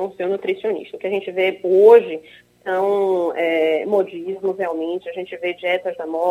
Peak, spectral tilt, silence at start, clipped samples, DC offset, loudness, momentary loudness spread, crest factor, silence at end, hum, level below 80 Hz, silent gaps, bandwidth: -2 dBFS; -6 dB/octave; 0 s; under 0.1%; under 0.1%; -19 LUFS; 13 LU; 18 dB; 0 s; none; -72 dBFS; none; 5.2 kHz